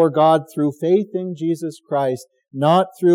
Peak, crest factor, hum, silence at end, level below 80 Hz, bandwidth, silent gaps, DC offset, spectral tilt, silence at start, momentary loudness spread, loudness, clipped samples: -4 dBFS; 14 dB; none; 0 s; -82 dBFS; 15.5 kHz; none; under 0.1%; -7.5 dB/octave; 0 s; 10 LU; -19 LUFS; under 0.1%